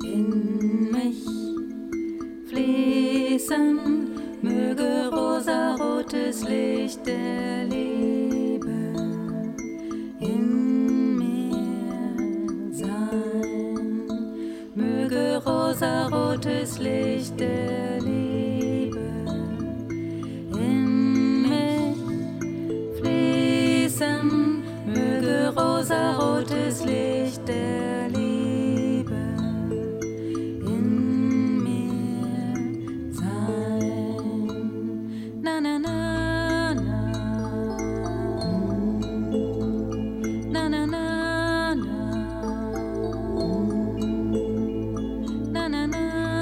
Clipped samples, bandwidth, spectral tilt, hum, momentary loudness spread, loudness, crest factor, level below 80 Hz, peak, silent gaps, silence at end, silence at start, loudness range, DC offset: under 0.1%; 16 kHz; -6 dB/octave; none; 8 LU; -25 LUFS; 16 dB; -46 dBFS; -8 dBFS; none; 0 s; 0 s; 4 LU; under 0.1%